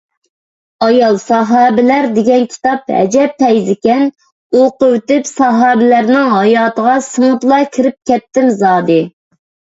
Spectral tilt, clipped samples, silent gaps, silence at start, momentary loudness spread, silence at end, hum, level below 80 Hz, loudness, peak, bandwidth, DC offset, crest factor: -5.5 dB/octave; under 0.1%; 4.32-4.50 s; 0.8 s; 5 LU; 0.65 s; none; -56 dBFS; -11 LUFS; 0 dBFS; 8 kHz; under 0.1%; 10 dB